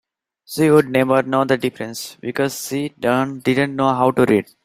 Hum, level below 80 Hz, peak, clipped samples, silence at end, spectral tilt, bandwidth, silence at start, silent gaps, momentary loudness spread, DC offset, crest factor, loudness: none; -58 dBFS; -2 dBFS; under 0.1%; 0.2 s; -5.5 dB/octave; 16 kHz; 0.5 s; none; 12 LU; under 0.1%; 16 dB; -18 LUFS